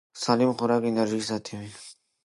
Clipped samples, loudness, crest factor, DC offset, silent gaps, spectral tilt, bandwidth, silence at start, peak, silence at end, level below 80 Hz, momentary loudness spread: under 0.1%; -25 LUFS; 20 dB; under 0.1%; none; -5 dB/octave; 11.5 kHz; 0.15 s; -6 dBFS; 0.3 s; -66 dBFS; 19 LU